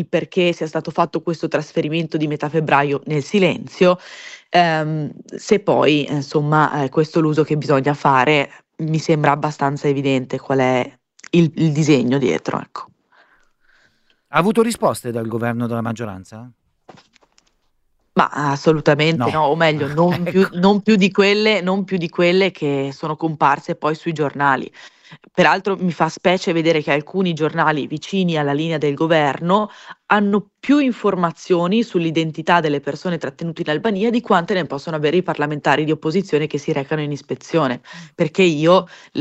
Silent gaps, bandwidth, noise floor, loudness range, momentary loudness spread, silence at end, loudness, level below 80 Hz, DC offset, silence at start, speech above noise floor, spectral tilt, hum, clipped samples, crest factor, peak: none; 13.5 kHz; -63 dBFS; 5 LU; 9 LU; 0 s; -18 LUFS; -58 dBFS; under 0.1%; 0 s; 46 dB; -6 dB/octave; none; under 0.1%; 18 dB; 0 dBFS